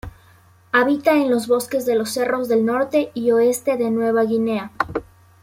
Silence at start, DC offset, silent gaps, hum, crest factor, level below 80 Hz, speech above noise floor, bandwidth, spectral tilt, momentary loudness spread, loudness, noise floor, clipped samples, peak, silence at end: 0.05 s; under 0.1%; none; none; 16 dB; -52 dBFS; 33 dB; 16.5 kHz; -4.5 dB/octave; 7 LU; -19 LUFS; -51 dBFS; under 0.1%; -4 dBFS; 0.4 s